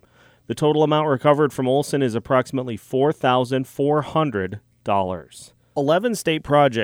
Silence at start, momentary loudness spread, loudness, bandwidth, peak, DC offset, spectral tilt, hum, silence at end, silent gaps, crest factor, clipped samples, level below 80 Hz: 0.5 s; 10 LU; -21 LUFS; 18.5 kHz; -4 dBFS; under 0.1%; -6 dB/octave; none; 0 s; none; 16 dB; under 0.1%; -56 dBFS